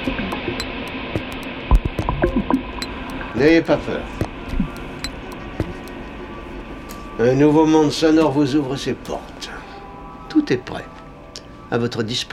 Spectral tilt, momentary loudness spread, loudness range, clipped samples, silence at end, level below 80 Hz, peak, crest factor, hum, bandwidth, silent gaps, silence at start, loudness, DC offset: -6 dB/octave; 18 LU; 8 LU; under 0.1%; 0 s; -30 dBFS; -2 dBFS; 18 dB; none; 14 kHz; none; 0 s; -20 LUFS; under 0.1%